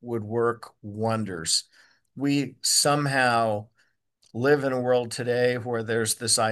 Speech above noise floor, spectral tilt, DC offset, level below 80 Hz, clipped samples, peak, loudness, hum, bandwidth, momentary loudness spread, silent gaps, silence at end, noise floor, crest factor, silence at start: 44 dB; -3.5 dB/octave; under 0.1%; -70 dBFS; under 0.1%; -6 dBFS; -24 LUFS; none; 12.5 kHz; 9 LU; none; 0 s; -69 dBFS; 20 dB; 0.05 s